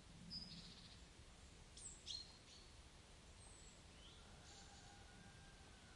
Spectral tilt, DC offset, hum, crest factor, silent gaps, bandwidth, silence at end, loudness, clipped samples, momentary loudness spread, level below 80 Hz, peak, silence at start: -2.5 dB/octave; under 0.1%; none; 22 dB; none; 12 kHz; 0 s; -58 LUFS; under 0.1%; 11 LU; -68 dBFS; -38 dBFS; 0 s